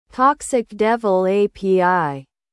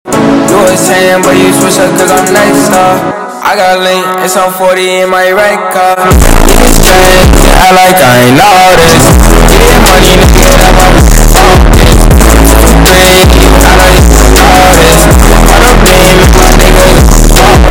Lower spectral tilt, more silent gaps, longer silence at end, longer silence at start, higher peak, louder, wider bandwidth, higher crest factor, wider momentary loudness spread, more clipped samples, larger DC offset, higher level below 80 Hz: first, -5.5 dB/octave vs -4 dB/octave; neither; first, 0.3 s vs 0 s; about the same, 0.15 s vs 0.05 s; second, -4 dBFS vs 0 dBFS; second, -18 LUFS vs -3 LUFS; second, 12 kHz vs over 20 kHz; first, 16 dB vs 2 dB; about the same, 6 LU vs 5 LU; second, under 0.1% vs 10%; neither; second, -54 dBFS vs -6 dBFS